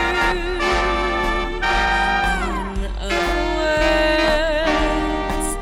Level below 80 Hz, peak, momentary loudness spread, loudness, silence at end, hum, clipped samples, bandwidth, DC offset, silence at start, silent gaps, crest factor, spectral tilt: -26 dBFS; -6 dBFS; 6 LU; -19 LUFS; 0 s; none; under 0.1%; 15.5 kHz; under 0.1%; 0 s; none; 14 dB; -4 dB/octave